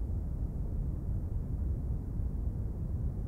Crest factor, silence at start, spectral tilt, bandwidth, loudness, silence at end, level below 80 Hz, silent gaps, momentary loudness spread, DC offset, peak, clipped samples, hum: 12 dB; 0 s; -11 dB/octave; 2.1 kHz; -37 LUFS; 0 s; -36 dBFS; none; 2 LU; under 0.1%; -22 dBFS; under 0.1%; none